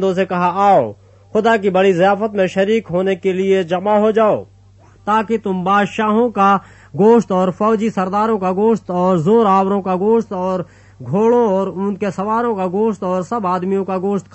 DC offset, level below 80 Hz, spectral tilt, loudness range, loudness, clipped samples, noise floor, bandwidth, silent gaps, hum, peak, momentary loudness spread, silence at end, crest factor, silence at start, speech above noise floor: under 0.1%; -54 dBFS; -7 dB/octave; 3 LU; -16 LUFS; under 0.1%; -46 dBFS; 8.4 kHz; none; none; -2 dBFS; 8 LU; 0.15 s; 14 dB; 0 s; 31 dB